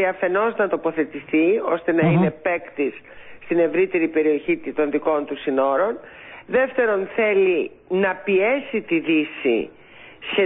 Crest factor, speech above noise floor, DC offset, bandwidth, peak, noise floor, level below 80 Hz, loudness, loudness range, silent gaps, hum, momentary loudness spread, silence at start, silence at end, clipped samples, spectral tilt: 14 dB; 22 dB; under 0.1%; 4 kHz; -6 dBFS; -43 dBFS; -60 dBFS; -21 LUFS; 1 LU; none; none; 7 LU; 0 s; 0 s; under 0.1%; -11.5 dB/octave